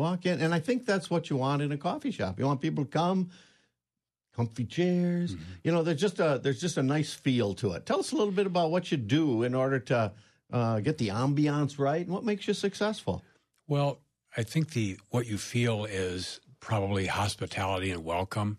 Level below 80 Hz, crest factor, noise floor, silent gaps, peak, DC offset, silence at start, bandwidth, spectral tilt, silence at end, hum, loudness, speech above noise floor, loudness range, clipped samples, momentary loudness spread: -64 dBFS; 16 dB; under -90 dBFS; none; -14 dBFS; under 0.1%; 0 s; 13 kHz; -6 dB/octave; 0 s; none; -30 LUFS; over 61 dB; 3 LU; under 0.1%; 7 LU